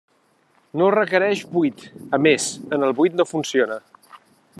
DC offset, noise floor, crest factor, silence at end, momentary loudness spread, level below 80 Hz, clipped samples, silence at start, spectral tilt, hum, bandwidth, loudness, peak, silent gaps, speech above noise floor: under 0.1%; -61 dBFS; 20 dB; 0.45 s; 8 LU; -72 dBFS; under 0.1%; 0.75 s; -4.5 dB/octave; none; 12.5 kHz; -20 LUFS; -2 dBFS; none; 42 dB